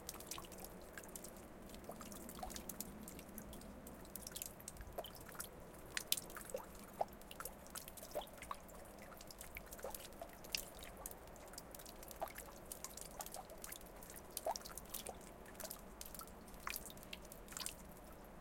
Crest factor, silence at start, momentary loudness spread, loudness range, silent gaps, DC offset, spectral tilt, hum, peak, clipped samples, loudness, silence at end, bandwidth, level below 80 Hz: 40 dB; 0 s; 10 LU; 5 LU; none; under 0.1%; -2.5 dB/octave; none; -12 dBFS; under 0.1%; -50 LUFS; 0 s; 17 kHz; -62 dBFS